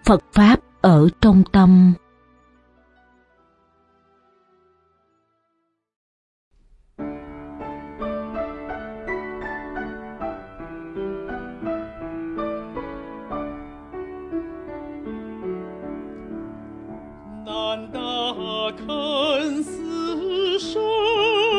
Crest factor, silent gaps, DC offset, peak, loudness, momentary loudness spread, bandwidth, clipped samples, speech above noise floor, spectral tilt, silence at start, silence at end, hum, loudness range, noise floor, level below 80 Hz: 22 dB; 5.96-6.51 s; under 0.1%; -2 dBFS; -21 LUFS; 22 LU; 10.5 kHz; under 0.1%; 60 dB; -7 dB/octave; 0.05 s; 0 s; none; 17 LU; -72 dBFS; -42 dBFS